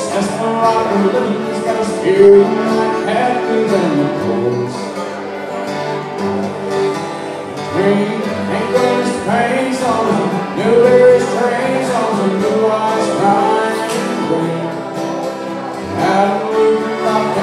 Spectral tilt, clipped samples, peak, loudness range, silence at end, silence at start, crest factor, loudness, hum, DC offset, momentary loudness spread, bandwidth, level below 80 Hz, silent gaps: -5.5 dB/octave; under 0.1%; 0 dBFS; 6 LU; 0 s; 0 s; 14 dB; -15 LUFS; none; under 0.1%; 12 LU; 13.5 kHz; -56 dBFS; none